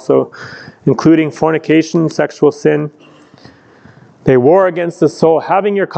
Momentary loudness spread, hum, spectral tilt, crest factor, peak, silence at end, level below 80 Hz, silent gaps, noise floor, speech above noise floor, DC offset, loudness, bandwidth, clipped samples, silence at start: 9 LU; none; -7 dB/octave; 12 dB; 0 dBFS; 0 s; -52 dBFS; none; -42 dBFS; 30 dB; under 0.1%; -12 LUFS; 8.6 kHz; under 0.1%; 0.1 s